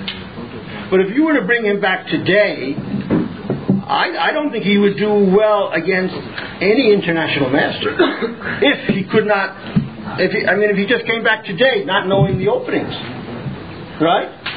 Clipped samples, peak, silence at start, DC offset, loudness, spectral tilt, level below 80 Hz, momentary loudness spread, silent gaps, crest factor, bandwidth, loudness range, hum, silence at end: under 0.1%; -2 dBFS; 0 s; 0.3%; -16 LUFS; -4 dB/octave; -48 dBFS; 13 LU; none; 16 dB; 5 kHz; 2 LU; none; 0 s